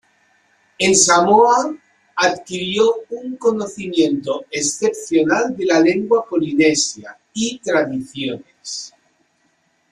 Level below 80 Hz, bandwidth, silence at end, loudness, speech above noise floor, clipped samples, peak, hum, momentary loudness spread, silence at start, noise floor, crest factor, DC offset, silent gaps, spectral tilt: -60 dBFS; 12.5 kHz; 1.05 s; -17 LUFS; 46 dB; under 0.1%; 0 dBFS; none; 17 LU; 0.8 s; -63 dBFS; 18 dB; under 0.1%; none; -3 dB/octave